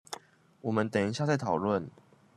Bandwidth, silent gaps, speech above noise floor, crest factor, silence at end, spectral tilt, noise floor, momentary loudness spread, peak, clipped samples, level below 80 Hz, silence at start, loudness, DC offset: 13 kHz; none; 26 dB; 20 dB; 0.45 s; -6.5 dB/octave; -55 dBFS; 16 LU; -12 dBFS; under 0.1%; -72 dBFS; 0.1 s; -31 LUFS; under 0.1%